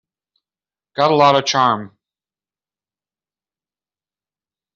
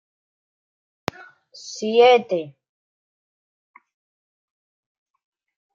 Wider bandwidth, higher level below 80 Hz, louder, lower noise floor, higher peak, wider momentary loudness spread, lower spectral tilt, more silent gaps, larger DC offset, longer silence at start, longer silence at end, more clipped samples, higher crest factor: about the same, 7.6 kHz vs 7.6 kHz; about the same, -66 dBFS vs -70 dBFS; first, -15 LUFS vs -18 LUFS; about the same, under -90 dBFS vs under -90 dBFS; about the same, -2 dBFS vs -4 dBFS; second, 11 LU vs 23 LU; about the same, -3 dB/octave vs -4 dB/octave; neither; neither; second, 0.95 s vs 1.65 s; second, 2.9 s vs 3.25 s; neither; about the same, 20 dB vs 22 dB